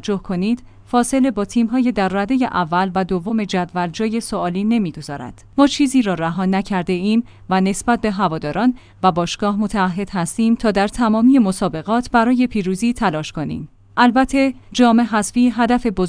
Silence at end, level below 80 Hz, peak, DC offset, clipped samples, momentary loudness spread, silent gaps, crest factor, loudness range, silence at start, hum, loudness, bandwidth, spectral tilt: 0 s; -42 dBFS; 0 dBFS; under 0.1%; under 0.1%; 8 LU; none; 16 dB; 2 LU; 0 s; none; -18 LUFS; 10.5 kHz; -5.5 dB/octave